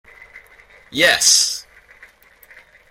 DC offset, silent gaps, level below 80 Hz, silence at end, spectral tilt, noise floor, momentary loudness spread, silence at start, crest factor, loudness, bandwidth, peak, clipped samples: under 0.1%; none; -58 dBFS; 1.3 s; 0.5 dB/octave; -49 dBFS; 17 LU; 0.35 s; 22 dB; -13 LUFS; 16.5 kHz; 0 dBFS; under 0.1%